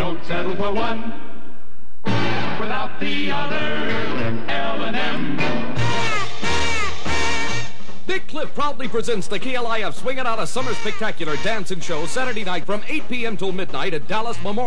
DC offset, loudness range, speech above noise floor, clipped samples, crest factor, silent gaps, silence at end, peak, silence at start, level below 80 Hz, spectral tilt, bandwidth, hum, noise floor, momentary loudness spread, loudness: 20%; 2 LU; 21 dB; under 0.1%; 12 dB; none; 0 s; -6 dBFS; 0 s; -44 dBFS; -4.5 dB/octave; 11 kHz; none; -45 dBFS; 5 LU; -24 LUFS